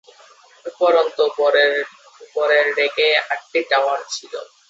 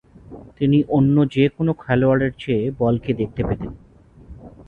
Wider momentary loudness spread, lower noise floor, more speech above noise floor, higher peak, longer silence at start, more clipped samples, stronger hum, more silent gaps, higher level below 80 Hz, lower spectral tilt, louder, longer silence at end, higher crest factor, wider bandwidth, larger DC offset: first, 14 LU vs 8 LU; first, -49 dBFS vs -43 dBFS; first, 31 dB vs 25 dB; first, -2 dBFS vs -6 dBFS; first, 0.65 s vs 0.3 s; neither; neither; neither; second, -76 dBFS vs -42 dBFS; second, -0.5 dB/octave vs -9.5 dB/octave; about the same, -18 LUFS vs -20 LUFS; first, 0.25 s vs 0.05 s; about the same, 16 dB vs 14 dB; first, 8 kHz vs 4.3 kHz; neither